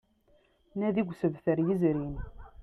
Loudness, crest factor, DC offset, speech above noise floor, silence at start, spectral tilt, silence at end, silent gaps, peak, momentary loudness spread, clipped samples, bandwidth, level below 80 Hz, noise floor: -30 LUFS; 16 dB; under 0.1%; 37 dB; 0.75 s; -10 dB/octave; 0 s; none; -16 dBFS; 15 LU; under 0.1%; 6 kHz; -50 dBFS; -66 dBFS